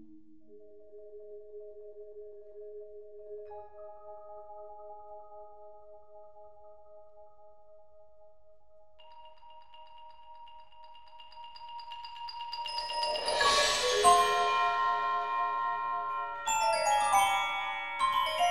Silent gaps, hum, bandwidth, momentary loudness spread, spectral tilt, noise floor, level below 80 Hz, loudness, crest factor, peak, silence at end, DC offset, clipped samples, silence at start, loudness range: none; none; 16 kHz; 26 LU; 0 dB/octave; -63 dBFS; -64 dBFS; -29 LUFS; 24 dB; -10 dBFS; 0 s; 0.3%; under 0.1%; 0 s; 24 LU